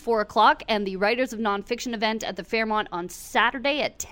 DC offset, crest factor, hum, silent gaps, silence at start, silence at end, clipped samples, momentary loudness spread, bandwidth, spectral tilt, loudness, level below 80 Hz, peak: under 0.1%; 20 dB; none; none; 0.05 s; 0 s; under 0.1%; 9 LU; 17 kHz; -3 dB/octave; -24 LUFS; -52 dBFS; -6 dBFS